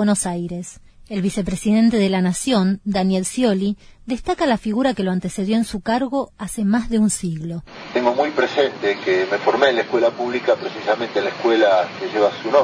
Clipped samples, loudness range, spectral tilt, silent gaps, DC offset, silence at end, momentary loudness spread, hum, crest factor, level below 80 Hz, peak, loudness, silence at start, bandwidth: under 0.1%; 3 LU; -5 dB/octave; none; under 0.1%; 0 s; 10 LU; none; 18 dB; -46 dBFS; -2 dBFS; -20 LUFS; 0 s; 11 kHz